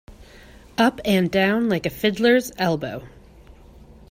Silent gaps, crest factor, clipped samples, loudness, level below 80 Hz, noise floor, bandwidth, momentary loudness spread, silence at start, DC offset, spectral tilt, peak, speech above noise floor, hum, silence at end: none; 18 dB; under 0.1%; -21 LUFS; -50 dBFS; -47 dBFS; 16 kHz; 11 LU; 0.1 s; under 0.1%; -5.5 dB/octave; -4 dBFS; 26 dB; none; 0.6 s